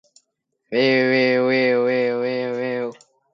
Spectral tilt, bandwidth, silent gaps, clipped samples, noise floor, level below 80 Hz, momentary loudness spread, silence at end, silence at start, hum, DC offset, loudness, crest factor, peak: -6.5 dB/octave; 7.6 kHz; none; under 0.1%; -73 dBFS; -74 dBFS; 9 LU; 0.4 s; 0.7 s; none; under 0.1%; -19 LUFS; 14 dB; -6 dBFS